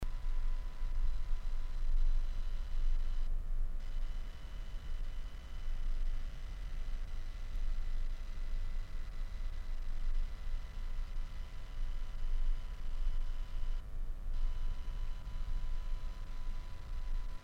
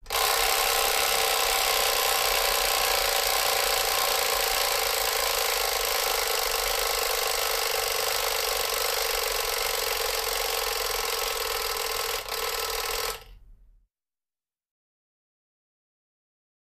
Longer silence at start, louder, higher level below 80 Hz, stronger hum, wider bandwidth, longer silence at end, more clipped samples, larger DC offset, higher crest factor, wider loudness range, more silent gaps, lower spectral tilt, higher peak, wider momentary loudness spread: about the same, 0 s vs 0.05 s; second, -45 LUFS vs -24 LUFS; first, -34 dBFS vs -48 dBFS; neither; second, 5.2 kHz vs 15.5 kHz; second, 0 s vs 3.15 s; neither; neither; second, 12 dB vs 20 dB; second, 4 LU vs 9 LU; neither; first, -5.5 dB/octave vs 1 dB/octave; second, -22 dBFS vs -8 dBFS; about the same, 6 LU vs 5 LU